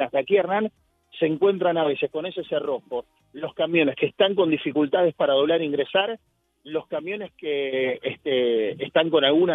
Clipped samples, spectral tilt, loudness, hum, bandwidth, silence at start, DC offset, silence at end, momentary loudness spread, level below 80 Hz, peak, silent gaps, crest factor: under 0.1%; -8 dB/octave; -23 LUFS; none; 4 kHz; 0 s; under 0.1%; 0 s; 11 LU; -68 dBFS; -6 dBFS; none; 18 dB